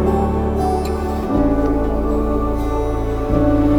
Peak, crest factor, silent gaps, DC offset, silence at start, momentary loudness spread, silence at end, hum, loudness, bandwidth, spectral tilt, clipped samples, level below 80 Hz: -4 dBFS; 12 dB; none; under 0.1%; 0 s; 5 LU; 0 s; none; -19 LUFS; 18.5 kHz; -8.5 dB/octave; under 0.1%; -22 dBFS